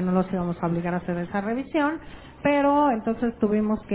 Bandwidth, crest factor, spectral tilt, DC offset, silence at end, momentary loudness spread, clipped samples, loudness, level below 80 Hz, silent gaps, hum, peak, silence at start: 4 kHz; 16 dB; -11.5 dB/octave; under 0.1%; 0 s; 8 LU; under 0.1%; -25 LUFS; -50 dBFS; none; none; -8 dBFS; 0 s